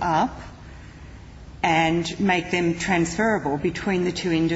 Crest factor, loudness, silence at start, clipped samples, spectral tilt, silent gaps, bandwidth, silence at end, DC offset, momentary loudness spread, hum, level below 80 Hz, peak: 16 dB; -23 LUFS; 0 s; under 0.1%; -5 dB/octave; none; 8 kHz; 0 s; under 0.1%; 22 LU; none; -44 dBFS; -8 dBFS